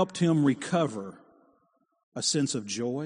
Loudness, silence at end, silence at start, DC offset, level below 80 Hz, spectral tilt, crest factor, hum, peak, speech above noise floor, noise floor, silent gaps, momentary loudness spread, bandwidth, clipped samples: -27 LUFS; 0 s; 0 s; under 0.1%; -72 dBFS; -5 dB/octave; 18 dB; none; -12 dBFS; 43 dB; -71 dBFS; 2.03-2.12 s; 16 LU; 10 kHz; under 0.1%